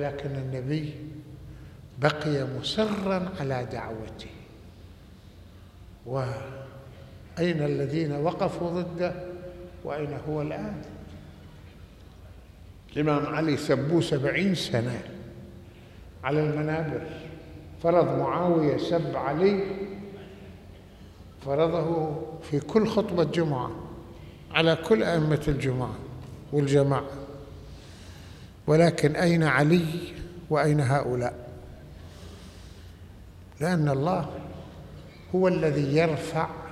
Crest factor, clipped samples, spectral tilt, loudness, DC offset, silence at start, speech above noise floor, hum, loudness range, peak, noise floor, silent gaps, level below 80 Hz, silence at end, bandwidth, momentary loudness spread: 22 dB; under 0.1%; -7 dB/octave; -27 LUFS; under 0.1%; 0 s; 23 dB; none; 8 LU; -6 dBFS; -49 dBFS; none; -52 dBFS; 0 s; 13.5 kHz; 22 LU